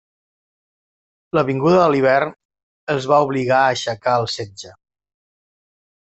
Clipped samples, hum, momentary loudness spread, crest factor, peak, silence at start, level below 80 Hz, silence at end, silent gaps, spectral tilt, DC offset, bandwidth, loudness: under 0.1%; none; 13 LU; 18 dB; -2 dBFS; 1.35 s; -58 dBFS; 1.3 s; 2.45-2.49 s, 2.63-2.87 s; -5.5 dB/octave; under 0.1%; 8.2 kHz; -18 LUFS